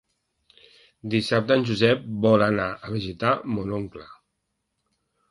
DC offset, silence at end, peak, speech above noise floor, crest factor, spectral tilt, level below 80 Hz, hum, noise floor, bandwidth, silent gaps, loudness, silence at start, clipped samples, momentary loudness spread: under 0.1%; 1.15 s; -4 dBFS; 55 dB; 20 dB; -6.5 dB/octave; -54 dBFS; none; -78 dBFS; 11.5 kHz; none; -23 LUFS; 1.05 s; under 0.1%; 12 LU